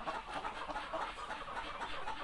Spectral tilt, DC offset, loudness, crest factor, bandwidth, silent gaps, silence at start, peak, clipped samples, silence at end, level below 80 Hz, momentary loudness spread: -3 dB/octave; under 0.1%; -42 LUFS; 14 dB; 11.5 kHz; none; 0 s; -28 dBFS; under 0.1%; 0 s; -58 dBFS; 2 LU